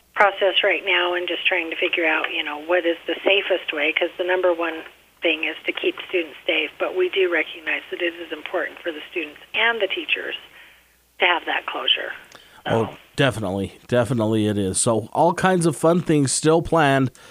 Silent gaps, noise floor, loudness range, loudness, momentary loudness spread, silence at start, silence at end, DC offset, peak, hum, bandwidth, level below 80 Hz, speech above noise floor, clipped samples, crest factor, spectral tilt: none; -55 dBFS; 4 LU; -21 LUFS; 9 LU; 0.15 s; 0 s; under 0.1%; 0 dBFS; none; 15.5 kHz; -54 dBFS; 34 dB; under 0.1%; 22 dB; -4 dB/octave